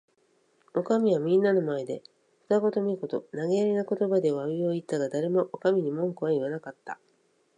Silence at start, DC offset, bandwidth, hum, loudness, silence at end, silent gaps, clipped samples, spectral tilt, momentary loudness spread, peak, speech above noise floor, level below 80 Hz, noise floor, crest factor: 0.75 s; under 0.1%; 10.5 kHz; none; -27 LUFS; 0.65 s; none; under 0.1%; -7.5 dB/octave; 13 LU; -12 dBFS; 41 dB; -80 dBFS; -68 dBFS; 16 dB